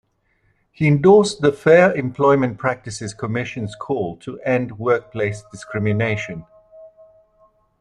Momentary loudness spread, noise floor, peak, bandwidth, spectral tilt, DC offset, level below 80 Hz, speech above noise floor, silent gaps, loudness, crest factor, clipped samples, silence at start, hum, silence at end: 15 LU; -64 dBFS; -2 dBFS; 11 kHz; -6.5 dB/octave; under 0.1%; -54 dBFS; 46 dB; none; -19 LUFS; 18 dB; under 0.1%; 0.8 s; none; 0.95 s